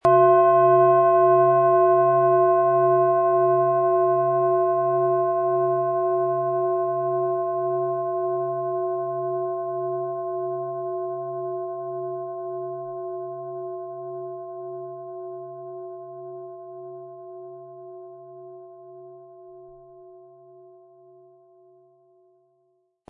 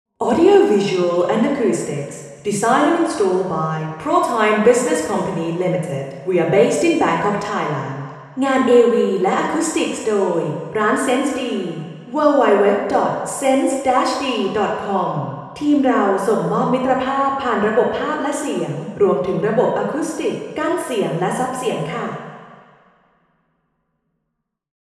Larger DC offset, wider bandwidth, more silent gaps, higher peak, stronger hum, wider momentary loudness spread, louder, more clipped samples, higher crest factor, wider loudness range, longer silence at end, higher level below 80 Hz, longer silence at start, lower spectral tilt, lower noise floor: neither; second, 3.3 kHz vs 13.5 kHz; neither; second, -6 dBFS vs 0 dBFS; neither; first, 22 LU vs 10 LU; second, -22 LUFS vs -18 LUFS; neither; about the same, 18 dB vs 18 dB; first, 22 LU vs 5 LU; first, 2.9 s vs 2.3 s; second, -72 dBFS vs -58 dBFS; second, 0.05 s vs 0.2 s; first, -10.5 dB/octave vs -5.5 dB/octave; second, -69 dBFS vs -76 dBFS